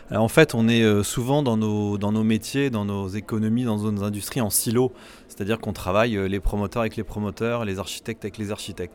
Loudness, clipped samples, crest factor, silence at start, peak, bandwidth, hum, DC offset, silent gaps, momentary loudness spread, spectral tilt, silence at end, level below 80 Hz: -24 LUFS; under 0.1%; 22 dB; 0 s; -2 dBFS; 18.5 kHz; none; under 0.1%; none; 12 LU; -5.5 dB/octave; 0.05 s; -42 dBFS